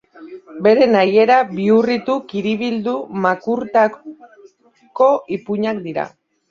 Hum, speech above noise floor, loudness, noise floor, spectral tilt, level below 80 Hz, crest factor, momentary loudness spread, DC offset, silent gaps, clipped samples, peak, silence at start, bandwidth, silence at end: none; 36 dB; -17 LUFS; -53 dBFS; -7 dB/octave; -62 dBFS; 16 dB; 12 LU; under 0.1%; none; under 0.1%; -2 dBFS; 0.2 s; 7.2 kHz; 0.4 s